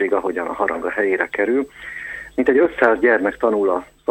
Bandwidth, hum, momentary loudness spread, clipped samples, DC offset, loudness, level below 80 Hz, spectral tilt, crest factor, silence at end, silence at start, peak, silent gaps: 8.4 kHz; none; 12 LU; under 0.1%; under 0.1%; -19 LUFS; -52 dBFS; -6 dB/octave; 18 dB; 0.25 s; 0 s; 0 dBFS; none